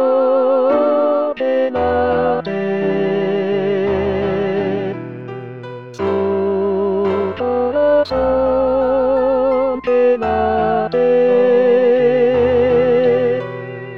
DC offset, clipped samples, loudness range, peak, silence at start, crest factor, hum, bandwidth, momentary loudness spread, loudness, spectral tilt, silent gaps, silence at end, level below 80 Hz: 0.5%; under 0.1%; 6 LU; -4 dBFS; 0 s; 12 dB; none; 5.8 kHz; 8 LU; -16 LUFS; -8.5 dB/octave; none; 0 s; -42 dBFS